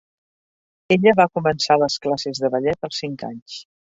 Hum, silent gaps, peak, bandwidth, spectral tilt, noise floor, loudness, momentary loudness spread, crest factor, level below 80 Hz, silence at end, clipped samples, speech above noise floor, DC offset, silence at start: none; 3.42-3.46 s; -2 dBFS; 8 kHz; -5 dB/octave; under -90 dBFS; -19 LUFS; 17 LU; 20 dB; -58 dBFS; 0.35 s; under 0.1%; over 71 dB; under 0.1%; 0.9 s